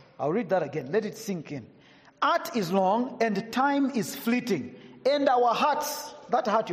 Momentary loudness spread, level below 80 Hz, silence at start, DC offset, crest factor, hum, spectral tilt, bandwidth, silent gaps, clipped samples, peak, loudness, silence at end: 11 LU; -74 dBFS; 0.2 s; under 0.1%; 16 dB; none; -5 dB/octave; 15.5 kHz; none; under 0.1%; -12 dBFS; -27 LUFS; 0 s